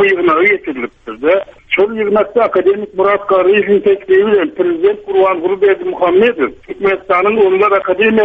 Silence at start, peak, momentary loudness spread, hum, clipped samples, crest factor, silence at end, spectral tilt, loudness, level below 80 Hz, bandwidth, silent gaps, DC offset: 0 s; 0 dBFS; 6 LU; none; under 0.1%; 12 dB; 0 s; -7.5 dB/octave; -12 LUFS; -50 dBFS; 3.9 kHz; none; under 0.1%